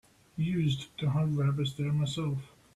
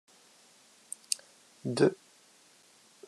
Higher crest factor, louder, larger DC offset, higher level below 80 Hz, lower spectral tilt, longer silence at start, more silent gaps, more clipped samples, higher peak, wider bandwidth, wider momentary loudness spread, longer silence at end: second, 12 dB vs 32 dB; about the same, -31 LUFS vs -31 LUFS; neither; first, -60 dBFS vs -86 dBFS; first, -7 dB/octave vs -4.5 dB/octave; second, 0.35 s vs 1.1 s; neither; neither; second, -18 dBFS vs -4 dBFS; second, 11.5 kHz vs 13 kHz; second, 6 LU vs 18 LU; second, 0.3 s vs 1.15 s